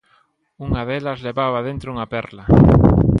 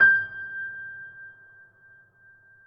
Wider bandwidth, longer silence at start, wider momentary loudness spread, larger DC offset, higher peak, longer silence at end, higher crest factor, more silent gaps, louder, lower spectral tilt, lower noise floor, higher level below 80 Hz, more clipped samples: first, 5.8 kHz vs 5.2 kHz; first, 0.6 s vs 0 s; second, 15 LU vs 23 LU; neither; first, 0 dBFS vs -8 dBFS; second, 0 s vs 1.35 s; about the same, 16 dB vs 20 dB; neither; first, -17 LUFS vs -26 LUFS; first, -10 dB/octave vs -5.5 dB/octave; first, -60 dBFS vs -56 dBFS; first, -28 dBFS vs -74 dBFS; neither